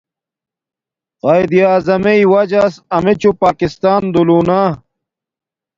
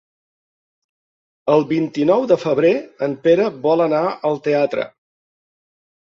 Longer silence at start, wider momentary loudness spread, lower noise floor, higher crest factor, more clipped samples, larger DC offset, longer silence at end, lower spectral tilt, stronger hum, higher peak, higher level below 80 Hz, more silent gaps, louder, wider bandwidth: second, 1.25 s vs 1.45 s; about the same, 5 LU vs 7 LU; about the same, -87 dBFS vs under -90 dBFS; about the same, 14 dB vs 16 dB; neither; neither; second, 1 s vs 1.25 s; about the same, -7.5 dB/octave vs -7 dB/octave; neither; about the same, 0 dBFS vs -2 dBFS; first, -48 dBFS vs -64 dBFS; neither; first, -12 LUFS vs -18 LUFS; about the same, 7.6 kHz vs 7.2 kHz